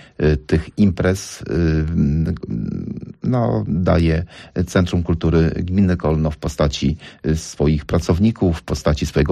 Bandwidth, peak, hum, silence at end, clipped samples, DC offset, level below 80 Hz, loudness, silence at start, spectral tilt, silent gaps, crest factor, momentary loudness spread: 13 kHz; -6 dBFS; none; 0 s; under 0.1%; under 0.1%; -30 dBFS; -19 LUFS; 0.2 s; -7 dB/octave; none; 12 dB; 8 LU